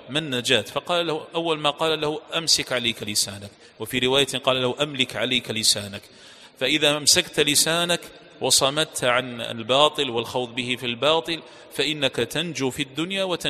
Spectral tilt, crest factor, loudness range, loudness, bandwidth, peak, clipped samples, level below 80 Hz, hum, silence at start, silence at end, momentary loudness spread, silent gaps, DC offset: -2 dB/octave; 22 dB; 3 LU; -22 LUFS; 15 kHz; -2 dBFS; under 0.1%; -58 dBFS; none; 0 s; 0 s; 9 LU; none; under 0.1%